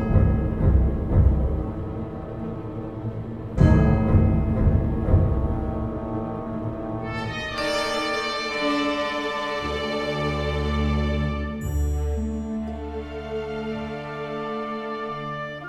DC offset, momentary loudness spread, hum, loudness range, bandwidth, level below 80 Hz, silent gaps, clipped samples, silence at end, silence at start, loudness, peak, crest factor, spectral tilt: under 0.1%; 12 LU; none; 7 LU; 13 kHz; -28 dBFS; none; under 0.1%; 0 s; 0 s; -25 LUFS; -4 dBFS; 18 dB; -7 dB/octave